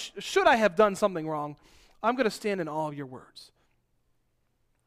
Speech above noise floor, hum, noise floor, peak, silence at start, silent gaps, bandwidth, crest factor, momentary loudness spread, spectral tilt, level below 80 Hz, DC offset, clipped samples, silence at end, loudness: 45 dB; none; -72 dBFS; -10 dBFS; 0 s; none; 15.5 kHz; 20 dB; 17 LU; -4.5 dB/octave; -62 dBFS; under 0.1%; under 0.1%; 1.45 s; -27 LUFS